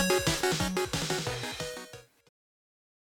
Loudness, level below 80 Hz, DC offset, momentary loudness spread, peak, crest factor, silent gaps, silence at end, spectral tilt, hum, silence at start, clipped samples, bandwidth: -30 LUFS; -52 dBFS; under 0.1%; 17 LU; -12 dBFS; 22 dB; none; 1.15 s; -3.5 dB/octave; none; 0 s; under 0.1%; 18 kHz